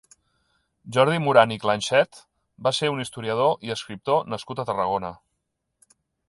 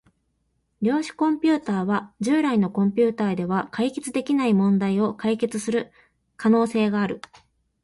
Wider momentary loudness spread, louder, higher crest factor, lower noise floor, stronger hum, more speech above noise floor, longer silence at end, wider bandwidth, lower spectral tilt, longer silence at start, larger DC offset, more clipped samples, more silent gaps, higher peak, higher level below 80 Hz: first, 12 LU vs 7 LU; about the same, -23 LUFS vs -23 LUFS; first, 22 dB vs 14 dB; first, -78 dBFS vs -71 dBFS; neither; first, 55 dB vs 49 dB; first, 1.15 s vs 0.65 s; about the same, 11.5 kHz vs 11.5 kHz; second, -4.5 dB/octave vs -6.5 dB/octave; about the same, 0.85 s vs 0.8 s; neither; neither; neither; first, -2 dBFS vs -8 dBFS; about the same, -62 dBFS vs -62 dBFS